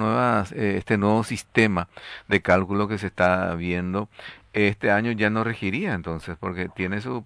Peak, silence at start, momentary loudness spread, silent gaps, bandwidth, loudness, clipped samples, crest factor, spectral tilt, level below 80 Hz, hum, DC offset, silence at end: -4 dBFS; 0 s; 10 LU; none; 11 kHz; -24 LUFS; under 0.1%; 20 dB; -6.5 dB/octave; -52 dBFS; none; under 0.1%; 0 s